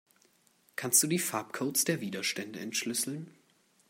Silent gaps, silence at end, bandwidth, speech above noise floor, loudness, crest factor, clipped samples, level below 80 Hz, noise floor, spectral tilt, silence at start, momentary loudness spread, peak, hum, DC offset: none; 0.6 s; 16 kHz; 36 dB; -30 LUFS; 24 dB; under 0.1%; -82 dBFS; -68 dBFS; -2.5 dB/octave; 0.8 s; 15 LU; -10 dBFS; none; under 0.1%